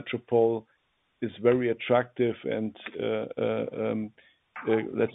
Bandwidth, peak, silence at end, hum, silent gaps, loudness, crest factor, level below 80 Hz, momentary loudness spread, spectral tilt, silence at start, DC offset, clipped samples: 4 kHz; -10 dBFS; 0 s; none; none; -28 LUFS; 20 dB; -70 dBFS; 11 LU; -9.5 dB/octave; 0 s; under 0.1%; under 0.1%